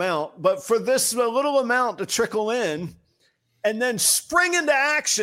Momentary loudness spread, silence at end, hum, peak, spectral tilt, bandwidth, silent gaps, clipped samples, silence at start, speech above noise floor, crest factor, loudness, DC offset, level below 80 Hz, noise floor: 7 LU; 0 s; none; -6 dBFS; -2 dB/octave; 16.5 kHz; none; under 0.1%; 0 s; 44 dB; 16 dB; -21 LUFS; under 0.1%; -64 dBFS; -67 dBFS